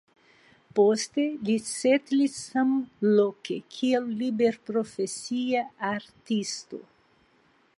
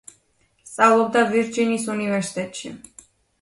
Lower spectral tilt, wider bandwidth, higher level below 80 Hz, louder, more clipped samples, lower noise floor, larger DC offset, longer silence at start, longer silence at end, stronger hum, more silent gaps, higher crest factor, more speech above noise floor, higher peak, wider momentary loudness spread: about the same, -4.5 dB/octave vs -4.5 dB/octave; about the same, 11.5 kHz vs 11.5 kHz; second, -74 dBFS vs -66 dBFS; second, -27 LUFS vs -20 LUFS; neither; about the same, -64 dBFS vs -64 dBFS; neither; about the same, 0.75 s vs 0.65 s; first, 0.95 s vs 0.65 s; neither; neither; about the same, 18 dB vs 20 dB; second, 38 dB vs 43 dB; second, -10 dBFS vs -4 dBFS; second, 10 LU vs 20 LU